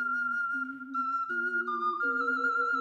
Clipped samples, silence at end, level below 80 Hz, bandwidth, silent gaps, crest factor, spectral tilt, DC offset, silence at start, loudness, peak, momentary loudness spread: under 0.1%; 0 s; under -90 dBFS; 8.2 kHz; none; 10 dB; -3.5 dB/octave; under 0.1%; 0 s; -30 LUFS; -20 dBFS; 5 LU